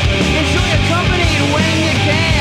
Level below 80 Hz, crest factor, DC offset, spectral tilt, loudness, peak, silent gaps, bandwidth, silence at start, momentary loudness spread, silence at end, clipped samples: -24 dBFS; 12 dB; under 0.1%; -4.5 dB/octave; -13 LUFS; -2 dBFS; none; 14 kHz; 0 s; 1 LU; 0 s; under 0.1%